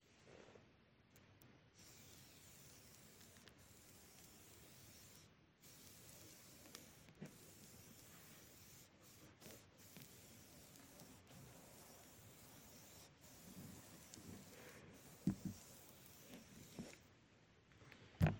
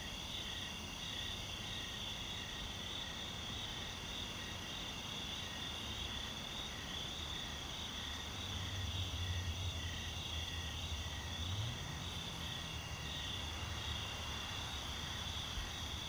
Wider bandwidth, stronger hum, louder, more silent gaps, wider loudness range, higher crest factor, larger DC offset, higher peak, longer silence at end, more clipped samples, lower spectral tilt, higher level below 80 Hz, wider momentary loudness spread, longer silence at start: second, 16.5 kHz vs over 20 kHz; neither; second, -58 LUFS vs -42 LUFS; neither; first, 9 LU vs 1 LU; first, 32 dB vs 14 dB; neither; first, -22 dBFS vs -30 dBFS; about the same, 0 s vs 0 s; neither; first, -5.5 dB/octave vs -3 dB/octave; second, -72 dBFS vs -52 dBFS; first, 8 LU vs 2 LU; about the same, 0 s vs 0 s